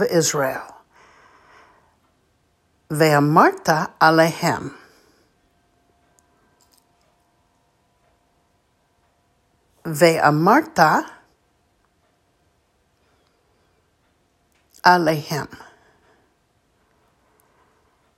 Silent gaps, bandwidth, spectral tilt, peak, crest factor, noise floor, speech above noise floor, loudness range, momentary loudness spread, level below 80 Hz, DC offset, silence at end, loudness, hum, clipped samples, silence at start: none; 16 kHz; -4.5 dB/octave; 0 dBFS; 22 dB; -65 dBFS; 47 dB; 7 LU; 17 LU; -64 dBFS; under 0.1%; 2.6 s; -18 LUFS; none; under 0.1%; 0 s